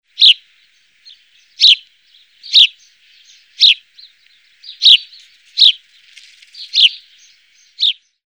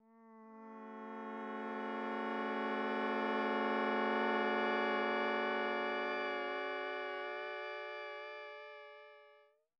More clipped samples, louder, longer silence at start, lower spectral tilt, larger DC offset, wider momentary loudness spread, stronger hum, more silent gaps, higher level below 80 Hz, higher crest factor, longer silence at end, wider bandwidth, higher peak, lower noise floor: neither; first, -9 LUFS vs -38 LUFS; about the same, 0.2 s vs 0.15 s; second, 8 dB/octave vs -5.5 dB/octave; neither; second, 9 LU vs 17 LU; neither; neither; first, -84 dBFS vs under -90 dBFS; about the same, 16 dB vs 16 dB; about the same, 0.35 s vs 0.45 s; first, over 20 kHz vs 7.4 kHz; first, 0 dBFS vs -24 dBFS; second, -54 dBFS vs -67 dBFS